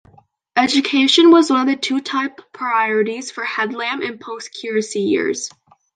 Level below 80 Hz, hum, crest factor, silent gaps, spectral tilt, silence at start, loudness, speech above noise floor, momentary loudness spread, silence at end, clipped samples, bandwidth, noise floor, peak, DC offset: -66 dBFS; none; 18 dB; none; -3 dB/octave; 0.55 s; -17 LUFS; 35 dB; 16 LU; 0.45 s; under 0.1%; 9.6 kHz; -52 dBFS; 0 dBFS; under 0.1%